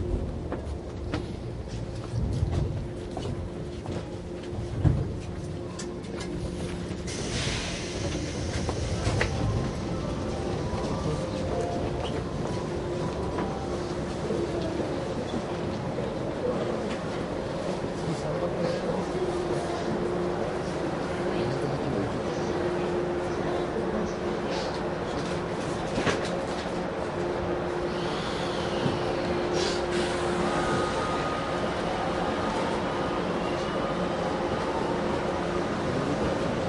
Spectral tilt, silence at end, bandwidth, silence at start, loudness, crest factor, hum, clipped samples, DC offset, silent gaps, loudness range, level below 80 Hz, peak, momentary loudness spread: -6 dB/octave; 0 s; 11.5 kHz; 0 s; -30 LUFS; 20 dB; none; under 0.1%; under 0.1%; none; 5 LU; -40 dBFS; -8 dBFS; 7 LU